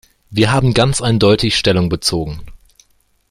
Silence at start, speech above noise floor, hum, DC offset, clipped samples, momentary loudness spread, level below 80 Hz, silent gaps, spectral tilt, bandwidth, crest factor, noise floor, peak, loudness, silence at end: 0.3 s; 43 dB; none; under 0.1%; under 0.1%; 11 LU; -36 dBFS; none; -5 dB/octave; 14.5 kHz; 16 dB; -57 dBFS; 0 dBFS; -14 LUFS; 0.75 s